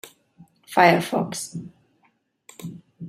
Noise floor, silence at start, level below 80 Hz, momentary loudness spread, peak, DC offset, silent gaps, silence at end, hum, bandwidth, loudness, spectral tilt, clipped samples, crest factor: -66 dBFS; 0.05 s; -66 dBFS; 22 LU; -2 dBFS; under 0.1%; none; 0 s; none; 16 kHz; -21 LUFS; -4.5 dB/octave; under 0.1%; 24 dB